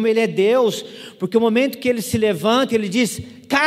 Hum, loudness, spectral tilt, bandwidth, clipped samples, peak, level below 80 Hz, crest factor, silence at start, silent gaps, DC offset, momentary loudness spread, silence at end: none; -18 LUFS; -4.5 dB/octave; 15.5 kHz; under 0.1%; -2 dBFS; -52 dBFS; 16 dB; 0 s; none; under 0.1%; 11 LU; 0 s